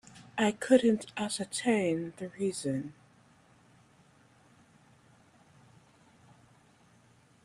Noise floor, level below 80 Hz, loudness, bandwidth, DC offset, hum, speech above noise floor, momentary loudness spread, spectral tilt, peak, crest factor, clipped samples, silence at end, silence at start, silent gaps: -63 dBFS; -74 dBFS; -30 LUFS; 14 kHz; under 0.1%; none; 33 dB; 13 LU; -4.5 dB/octave; -10 dBFS; 24 dB; under 0.1%; 4.5 s; 0.15 s; none